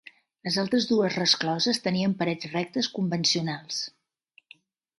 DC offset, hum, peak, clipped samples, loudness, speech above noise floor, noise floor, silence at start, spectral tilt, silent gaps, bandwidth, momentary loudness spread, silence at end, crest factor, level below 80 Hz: under 0.1%; none; -6 dBFS; under 0.1%; -26 LUFS; 37 dB; -63 dBFS; 0.45 s; -4 dB/octave; none; 11.5 kHz; 9 LU; 1.1 s; 22 dB; -70 dBFS